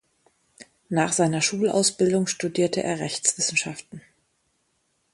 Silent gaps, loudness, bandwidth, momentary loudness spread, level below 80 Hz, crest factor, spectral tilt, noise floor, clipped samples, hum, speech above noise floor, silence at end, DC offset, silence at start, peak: none; -23 LUFS; 11.5 kHz; 6 LU; -66 dBFS; 20 dB; -3.5 dB/octave; -71 dBFS; under 0.1%; none; 47 dB; 1.15 s; under 0.1%; 0.6 s; -6 dBFS